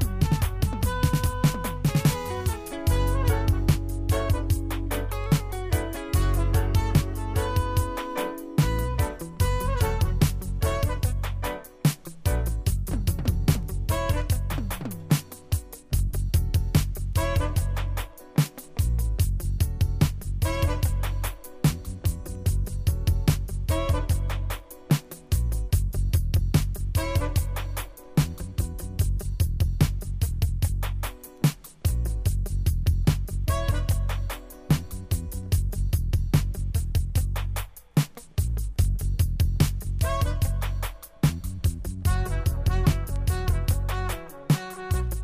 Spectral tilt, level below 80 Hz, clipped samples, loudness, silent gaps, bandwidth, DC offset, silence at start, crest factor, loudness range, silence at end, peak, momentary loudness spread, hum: -6 dB/octave; -28 dBFS; under 0.1%; -27 LUFS; none; 15.5 kHz; under 0.1%; 0 s; 18 dB; 2 LU; 0 s; -6 dBFS; 6 LU; none